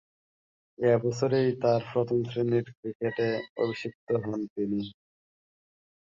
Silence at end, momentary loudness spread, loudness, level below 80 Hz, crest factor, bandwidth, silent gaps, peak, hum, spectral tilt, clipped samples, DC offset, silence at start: 1.2 s; 9 LU; -29 LUFS; -66 dBFS; 18 dB; 7.6 kHz; 2.77-2.83 s, 2.95-3.00 s, 3.50-3.56 s, 3.95-4.07 s, 4.50-4.56 s; -12 dBFS; none; -7.5 dB/octave; under 0.1%; under 0.1%; 0.8 s